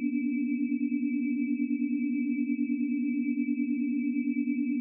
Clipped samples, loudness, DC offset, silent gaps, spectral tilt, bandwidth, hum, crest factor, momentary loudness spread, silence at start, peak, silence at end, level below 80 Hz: under 0.1%; -30 LUFS; under 0.1%; none; -8 dB/octave; 2.8 kHz; none; 10 dB; 0 LU; 0 s; -20 dBFS; 0 s; under -90 dBFS